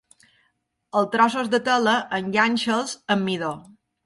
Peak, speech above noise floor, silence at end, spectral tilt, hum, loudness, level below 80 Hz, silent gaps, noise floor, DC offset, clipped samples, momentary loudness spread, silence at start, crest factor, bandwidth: -4 dBFS; 49 dB; 0.45 s; -4 dB/octave; none; -22 LUFS; -68 dBFS; none; -71 dBFS; under 0.1%; under 0.1%; 7 LU; 0.95 s; 18 dB; 11.5 kHz